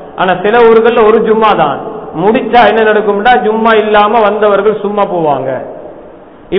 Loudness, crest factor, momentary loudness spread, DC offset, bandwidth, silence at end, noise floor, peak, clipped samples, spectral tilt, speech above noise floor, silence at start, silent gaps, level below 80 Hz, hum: -8 LUFS; 8 dB; 10 LU; under 0.1%; 5.4 kHz; 0 s; -33 dBFS; 0 dBFS; 0.9%; -8 dB/octave; 25 dB; 0 s; none; -42 dBFS; none